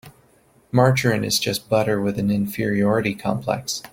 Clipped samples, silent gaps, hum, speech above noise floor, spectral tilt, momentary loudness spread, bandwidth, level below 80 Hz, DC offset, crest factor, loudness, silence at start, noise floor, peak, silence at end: under 0.1%; none; none; 36 dB; -5 dB/octave; 7 LU; 17 kHz; -52 dBFS; under 0.1%; 20 dB; -21 LUFS; 0.05 s; -57 dBFS; -2 dBFS; 0.05 s